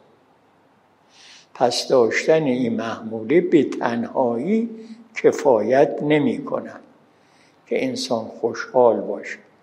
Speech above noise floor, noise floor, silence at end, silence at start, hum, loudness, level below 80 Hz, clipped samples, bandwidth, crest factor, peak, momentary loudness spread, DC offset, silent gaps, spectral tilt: 38 dB; -57 dBFS; 0.25 s; 1.55 s; none; -20 LUFS; -74 dBFS; under 0.1%; 12 kHz; 20 dB; -2 dBFS; 12 LU; under 0.1%; none; -5.5 dB/octave